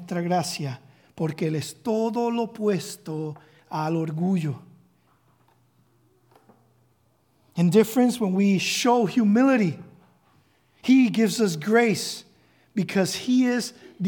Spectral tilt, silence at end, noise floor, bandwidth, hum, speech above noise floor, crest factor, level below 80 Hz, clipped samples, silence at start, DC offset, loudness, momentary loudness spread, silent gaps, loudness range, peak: -5.5 dB/octave; 0 s; -65 dBFS; 18 kHz; none; 43 dB; 18 dB; -74 dBFS; under 0.1%; 0 s; under 0.1%; -23 LUFS; 14 LU; none; 9 LU; -6 dBFS